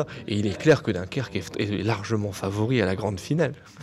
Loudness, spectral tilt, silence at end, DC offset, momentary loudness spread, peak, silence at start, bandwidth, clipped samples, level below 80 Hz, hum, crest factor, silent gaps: -26 LUFS; -6.5 dB/octave; 0 s; under 0.1%; 8 LU; -6 dBFS; 0 s; 13.5 kHz; under 0.1%; -54 dBFS; none; 18 dB; none